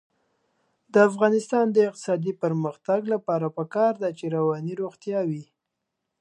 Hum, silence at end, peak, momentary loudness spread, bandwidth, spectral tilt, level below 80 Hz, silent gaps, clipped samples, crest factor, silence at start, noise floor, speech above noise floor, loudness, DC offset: none; 0.75 s; -4 dBFS; 9 LU; 11 kHz; -7 dB/octave; -78 dBFS; none; under 0.1%; 20 dB; 0.95 s; -82 dBFS; 58 dB; -24 LUFS; under 0.1%